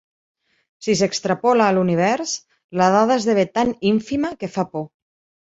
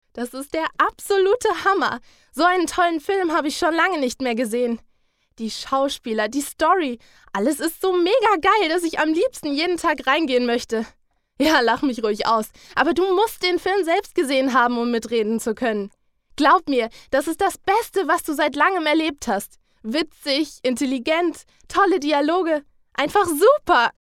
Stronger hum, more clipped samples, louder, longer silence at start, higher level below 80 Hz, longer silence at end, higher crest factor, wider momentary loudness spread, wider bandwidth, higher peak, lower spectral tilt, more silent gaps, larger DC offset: neither; neither; about the same, -19 LUFS vs -20 LUFS; first, 0.8 s vs 0.15 s; about the same, -58 dBFS vs -54 dBFS; first, 0.55 s vs 0.25 s; about the same, 18 dB vs 18 dB; first, 12 LU vs 9 LU; second, 8 kHz vs 17 kHz; about the same, -2 dBFS vs -4 dBFS; first, -5 dB/octave vs -3 dB/octave; first, 2.64-2.69 s vs none; neither